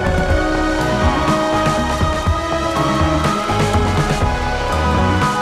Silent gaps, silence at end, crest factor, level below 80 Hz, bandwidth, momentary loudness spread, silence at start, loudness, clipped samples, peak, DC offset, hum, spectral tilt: none; 0 s; 14 dB; -24 dBFS; 14.5 kHz; 3 LU; 0 s; -17 LUFS; under 0.1%; -2 dBFS; under 0.1%; none; -5.5 dB/octave